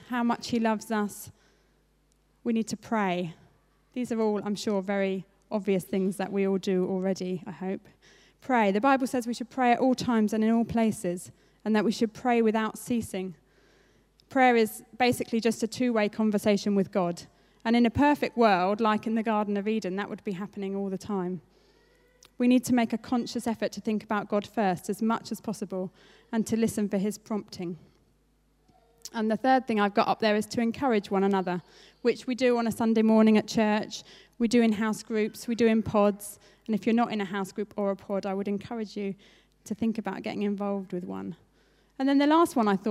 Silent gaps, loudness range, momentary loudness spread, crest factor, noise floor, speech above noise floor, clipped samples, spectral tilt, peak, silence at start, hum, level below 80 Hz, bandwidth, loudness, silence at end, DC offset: none; 7 LU; 12 LU; 20 dB; -67 dBFS; 40 dB; under 0.1%; -5.5 dB/octave; -8 dBFS; 0.1 s; none; -62 dBFS; 15 kHz; -27 LUFS; 0 s; under 0.1%